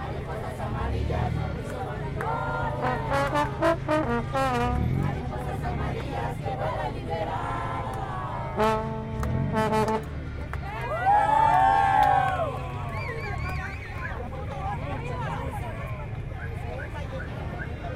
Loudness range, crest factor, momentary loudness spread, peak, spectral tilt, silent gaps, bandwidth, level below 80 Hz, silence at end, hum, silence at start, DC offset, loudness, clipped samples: 9 LU; 18 dB; 13 LU; -8 dBFS; -7 dB/octave; none; 16 kHz; -38 dBFS; 0 s; none; 0 s; under 0.1%; -28 LUFS; under 0.1%